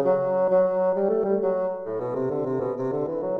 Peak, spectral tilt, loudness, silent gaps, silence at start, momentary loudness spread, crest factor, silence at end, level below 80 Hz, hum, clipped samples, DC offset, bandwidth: -10 dBFS; -10.5 dB/octave; -24 LUFS; none; 0 s; 7 LU; 14 dB; 0 s; -62 dBFS; none; under 0.1%; under 0.1%; 2.7 kHz